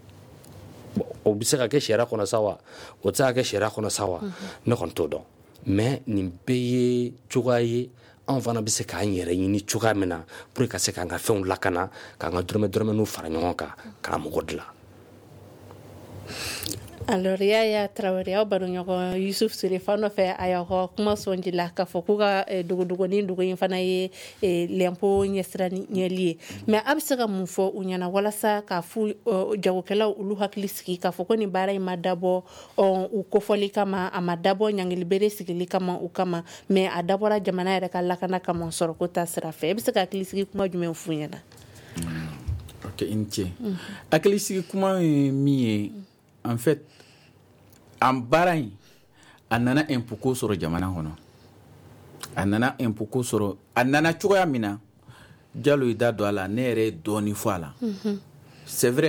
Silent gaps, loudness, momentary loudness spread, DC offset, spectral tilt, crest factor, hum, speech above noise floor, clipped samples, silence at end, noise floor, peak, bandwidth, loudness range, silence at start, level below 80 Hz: none; -26 LUFS; 10 LU; under 0.1%; -5 dB/octave; 18 dB; none; 30 dB; under 0.1%; 0 s; -55 dBFS; -6 dBFS; 20 kHz; 4 LU; 0.1 s; -54 dBFS